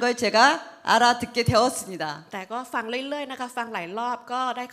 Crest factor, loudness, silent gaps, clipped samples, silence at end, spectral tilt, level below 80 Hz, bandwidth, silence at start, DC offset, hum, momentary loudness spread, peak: 20 dB; -24 LUFS; none; under 0.1%; 0.05 s; -3.5 dB/octave; -58 dBFS; 16 kHz; 0 s; under 0.1%; none; 13 LU; -4 dBFS